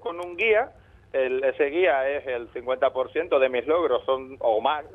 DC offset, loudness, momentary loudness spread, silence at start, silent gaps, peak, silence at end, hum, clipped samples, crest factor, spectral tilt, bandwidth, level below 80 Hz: under 0.1%; -24 LUFS; 9 LU; 0 s; none; -8 dBFS; 0 s; none; under 0.1%; 16 dB; -6 dB/octave; 4 kHz; -58 dBFS